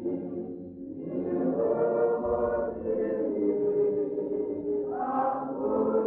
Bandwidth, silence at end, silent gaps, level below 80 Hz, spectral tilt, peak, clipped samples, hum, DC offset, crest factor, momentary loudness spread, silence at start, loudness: 2.9 kHz; 0 s; none; -58 dBFS; -12.5 dB/octave; -16 dBFS; under 0.1%; none; under 0.1%; 12 dB; 10 LU; 0 s; -29 LUFS